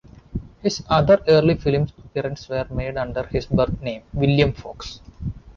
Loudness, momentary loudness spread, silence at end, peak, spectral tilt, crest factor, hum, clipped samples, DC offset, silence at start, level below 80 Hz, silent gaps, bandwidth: -21 LUFS; 18 LU; 0.05 s; -4 dBFS; -6.5 dB/octave; 18 dB; none; under 0.1%; under 0.1%; 0.35 s; -38 dBFS; none; 7.2 kHz